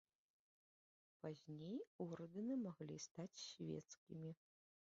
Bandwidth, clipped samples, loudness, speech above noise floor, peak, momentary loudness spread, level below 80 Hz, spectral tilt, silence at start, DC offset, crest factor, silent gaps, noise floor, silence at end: 7.4 kHz; under 0.1%; -52 LUFS; over 39 dB; -36 dBFS; 9 LU; -88 dBFS; -7 dB/octave; 1.25 s; under 0.1%; 18 dB; 1.87-1.99 s, 3.11-3.15 s, 3.97-4.07 s; under -90 dBFS; 0.55 s